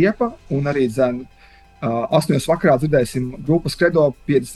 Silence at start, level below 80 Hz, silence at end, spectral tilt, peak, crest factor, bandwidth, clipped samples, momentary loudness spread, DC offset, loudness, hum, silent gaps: 0 s; -44 dBFS; 0 s; -6.5 dB/octave; -2 dBFS; 16 dB; 12.5 kHz; under 0.1%; 8 LU; under 0.1%; -19 LUFS; none; none